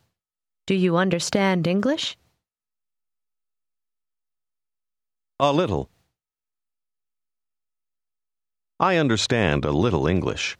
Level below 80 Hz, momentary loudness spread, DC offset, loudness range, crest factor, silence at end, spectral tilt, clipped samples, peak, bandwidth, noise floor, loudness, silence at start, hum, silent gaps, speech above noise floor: -48 dBFS; 6 LU; under 0.1%; 8 LU; 20 dB; 0.05 s; -5 dB/octave; under 0.1%; -4 dBFS; 12.5 kHz; under -90 dBFS; -22 LUFS; 0.65 s; none; none; over 69 dB